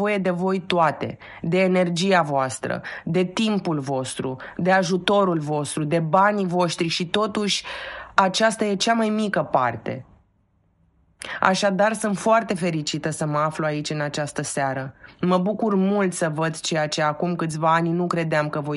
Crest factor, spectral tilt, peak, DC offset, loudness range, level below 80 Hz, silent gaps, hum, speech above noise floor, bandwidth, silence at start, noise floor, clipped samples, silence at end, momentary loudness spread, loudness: 22 dB; -5 dB/octave; 0 dBFS; under 0.1%; 3 LU; -60 dBFS; none; none; 42 dB; 11.5 kHz; 0 s; -64 dBFS; under 0.1%; 0 s; 8 LU; -22 LUFS